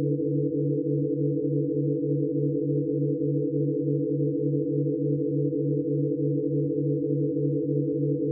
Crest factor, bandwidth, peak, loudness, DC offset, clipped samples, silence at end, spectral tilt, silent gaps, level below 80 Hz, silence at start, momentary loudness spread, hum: 12 dB; 0.6 kHz; -14 dBFS; -26 LUFS; under 0.1%; under 0.1%; 0 s; -20.5 dB/octave; none; -70 dBFS; 0 s; 1 LU; none